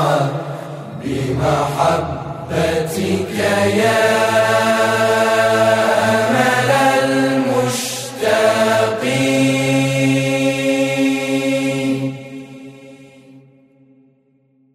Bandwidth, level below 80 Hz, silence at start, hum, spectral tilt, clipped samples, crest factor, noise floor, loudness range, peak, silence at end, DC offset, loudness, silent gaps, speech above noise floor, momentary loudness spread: 16 kHz; -48 dBFS; 0 s; none; -5 dB/octave; under 0.1%; 14 dB; -57 dBFS; 6 LU; -2 dBFS; 1.35 s; under 0.1%; -16 LUFS; none; 41 dB; 11 LU